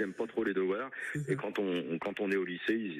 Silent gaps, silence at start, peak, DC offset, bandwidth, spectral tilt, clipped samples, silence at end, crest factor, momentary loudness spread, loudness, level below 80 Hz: none; 0 s; -18 dBFS; under 0.1%; 13.5 kHz; -6.5 dB/octave; under 0.1%; 0 s; 16 dB; 4 LU; -34 LUFS; -74 dBFS